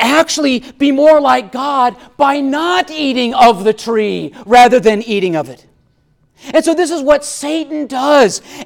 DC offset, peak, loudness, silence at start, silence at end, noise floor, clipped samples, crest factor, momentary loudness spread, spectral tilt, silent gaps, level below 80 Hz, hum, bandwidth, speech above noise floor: under 0.1%; 0 dBFS; -12 LUFS; 0 s; 0 s; -56 dBFS; under 0.1%; 12 dB; 10 LU; -3.5 dB/octave; none; -48 dBFS; none; 17.5 kHz; 44 dB